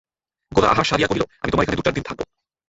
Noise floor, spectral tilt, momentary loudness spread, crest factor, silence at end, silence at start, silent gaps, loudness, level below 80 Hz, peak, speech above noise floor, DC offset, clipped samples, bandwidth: -43 dBFS; -5 dB/octave; 14 LU; 20 dB; 0.45 s; 0.5 s; none; -20 LUFS; -40 dBFS; -2 dBFS; 23 dB; under 0.1%; under 0.1%; 8.2 kHz